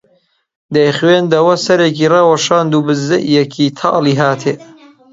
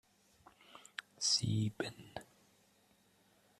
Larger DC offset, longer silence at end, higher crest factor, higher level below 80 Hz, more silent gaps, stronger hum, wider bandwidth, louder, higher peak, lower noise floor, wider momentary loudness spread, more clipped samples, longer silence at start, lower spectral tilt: neither; second, 0.5 s vs 1.35 s; second, 12 dB vs 22 dB; first, -58 dBFS vs -70 dBFS; neither; neither; second, 7.8 kHz vs 13.5 kHz; first, -12 LUFS vs -36 LUFS; first, 0 dBFS vs -20 dBFS; second, -57 dBFS vs -71 dBFS; second, 5 LU vs 22 LU; neither; about the same, 0.7 s vs 0.75 s; first, -5.5 dB/octave vs -3.5 dB/octave